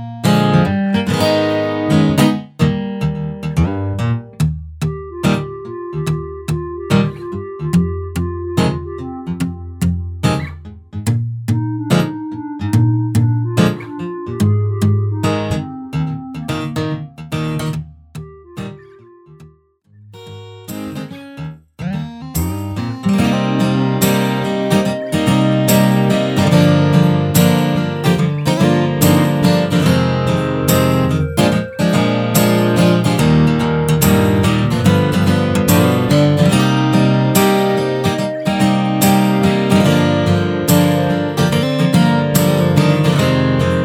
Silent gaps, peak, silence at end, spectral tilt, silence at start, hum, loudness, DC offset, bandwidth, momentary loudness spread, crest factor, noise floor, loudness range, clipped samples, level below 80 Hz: none; 0 dBFS; 0 s; -6 dB/octave; 0 s; none; -15 LUFS; under 0.1%; 18 kHz; 13 LU; 14 dB; -50 dBFS; 11 LU; under 0.1%; -38 dBFS